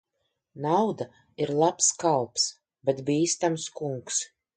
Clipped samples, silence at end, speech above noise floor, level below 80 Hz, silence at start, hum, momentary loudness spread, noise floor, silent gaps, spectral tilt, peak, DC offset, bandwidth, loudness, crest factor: under 0.1%; 0.3 s; 52 dB; -72 dBFS; 0.55 s; none; 11 LU; -79 dBFS; none; -3.5 dB/octave; -10 dBFS; under 0.1%; 9.6 kHz; -26 LUFS; 18 dB